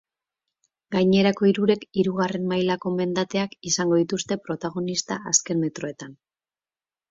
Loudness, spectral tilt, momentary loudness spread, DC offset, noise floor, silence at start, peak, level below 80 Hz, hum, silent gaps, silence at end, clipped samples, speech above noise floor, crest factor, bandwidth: -23 LUFS; -4.5 dB/octave; 9 LU; under 0.1%; under -90 dBFS; 0.9 s; -6 dBFS; -64 dBFS; none; none; 0.95 s; under 0.1%; over 67 dB; 20 dB; 7.8 kHz